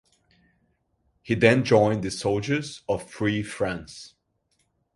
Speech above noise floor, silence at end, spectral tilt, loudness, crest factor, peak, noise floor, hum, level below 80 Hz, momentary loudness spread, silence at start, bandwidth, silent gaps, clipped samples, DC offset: 48 dB; 0.9 s; -6 dB/octave; -24 LUFS; 24 dB; -2 dBFS; -72 dBFS; none; -54 dBFS; 11 LU; 1.25 s; 11.5 kHz; none; under 0.1%; under 0.1%